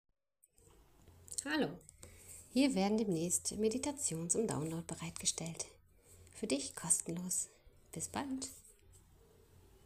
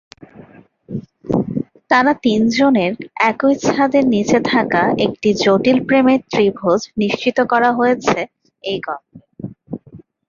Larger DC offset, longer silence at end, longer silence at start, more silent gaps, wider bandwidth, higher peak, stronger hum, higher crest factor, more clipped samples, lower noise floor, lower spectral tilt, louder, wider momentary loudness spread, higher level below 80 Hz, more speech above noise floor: neither; first, 0.85 s vs 0.25 s; first, 1.05 s vs 0.9 s; neither; first, 15.5 kHz vs 7.4 kHz; second, -16 dBFS vs 0 dBFS; neither; first, 22 dB vs 16 dB; neither; first, -71 dBFS vs -44 dBFS; second, -3.5 dB/octave vs -5.5 dB/octave; second, -37 LUFS vs -16 LUFS; about the same, 18 LU vs 17 LU; second, -68 dBFS vs -52 dBFS; first, 34 dB vs 29 dB